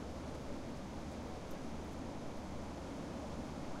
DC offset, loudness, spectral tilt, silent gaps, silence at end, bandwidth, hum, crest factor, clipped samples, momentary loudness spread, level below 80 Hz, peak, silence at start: under 0.1%; -46 LUFS; -6 dB/octave; none; 0 s; 16 kHz; none; 12 dB; under 0.1%; 1 LU; -54 dBFS; -32 dBFS; 0 s